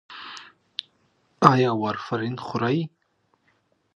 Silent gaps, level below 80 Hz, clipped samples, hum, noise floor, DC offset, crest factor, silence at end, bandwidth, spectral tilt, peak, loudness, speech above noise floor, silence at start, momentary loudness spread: none; -62 dBFS; under 0.1%; none; -69 dBFS; under 0.1%; 26 dB; 1.1 s; 9.8 kHz; -7 dB/octave; 0 dBFS; -23 LUFS; 47 dB; 0.1 s; 21 LU